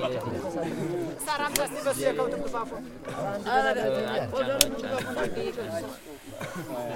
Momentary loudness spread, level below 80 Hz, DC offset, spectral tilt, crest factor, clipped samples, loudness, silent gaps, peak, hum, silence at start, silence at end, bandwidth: 13 LU; -52 dBFS; under 0.1%; -3.5 dB/octave; 30 dB; under 0.1%; -29 LUFS; none; 0 dBFS; none; 0 s; 0 s; 16.5 kHz